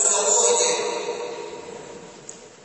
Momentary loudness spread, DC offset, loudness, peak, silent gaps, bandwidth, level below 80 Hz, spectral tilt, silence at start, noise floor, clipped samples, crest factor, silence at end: 23 LU; under 0.1%; -19 LUFS; -6 dBFS; none; 8.8 kHz; -74 dBFS; 0.5 dB/octave; 0 s; -43 dBFS; under 0.1%; 18 dB; 0.15 s